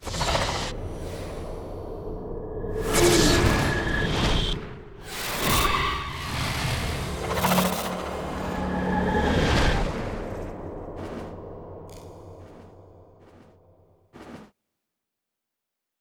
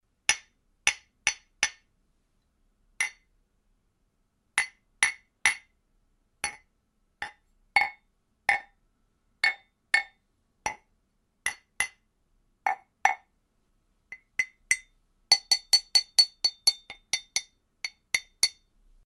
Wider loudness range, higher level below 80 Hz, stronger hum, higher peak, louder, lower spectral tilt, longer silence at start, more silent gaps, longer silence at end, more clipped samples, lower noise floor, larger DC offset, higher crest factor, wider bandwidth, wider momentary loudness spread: first, 17 LU vs 9 LU; first, -34 dBFS vs -66 dBFS; neither; second, -6 dBFS vs -2 dBFS; about the same, -26 LUFS vs -27 LUFS; first, -4 dB/octave vs 2.5 dB/octave; second, 0 s vs 0.3 s; neither; first, 1.55 s vs 0.55 s; neither; first, -84 dBFS vs -73 dBFS; neither; second, 20 dB vs 30 dB; first, over 20 kHz vs 12 kHz; first, 20 LU vs 17 LU